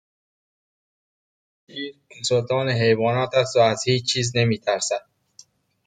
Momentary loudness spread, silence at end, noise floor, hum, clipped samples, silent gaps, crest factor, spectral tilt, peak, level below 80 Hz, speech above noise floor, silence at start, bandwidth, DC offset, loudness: 15 LU; 0.9 s; -53 dBFS; none; under 0.1%; none; 20 dB; -4.5 dB/octave; -4 dBFS; -62 dBFS; 32 dB; 1.75 s; 9.4 kHz; under 0.1%; -21 LUFS